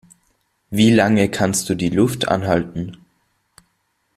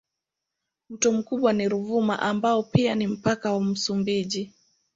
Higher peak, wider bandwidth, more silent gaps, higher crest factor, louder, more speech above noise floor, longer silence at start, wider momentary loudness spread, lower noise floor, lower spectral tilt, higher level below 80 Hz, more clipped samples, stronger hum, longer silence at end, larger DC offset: first, -2 dBFS vs -6 dBFS; first, 14.5 kHz vs 7.8 kHz; neither; about the same, 18 dB vs 20 dB; first, -18 LUFS vs -24 LUFS; second, 51 dB vs 61 dB; second, 0.7 s vs 0.9 s; first, 14 LU vs 5 LU; second, -68 dBFS vs -85 dBFS; about the same, -5 dB/octave vs -5 dB/octave; first, -50 dBFS vs -60 dBFS; neither; neither; first, 1.2 s vs 0.45 s; neither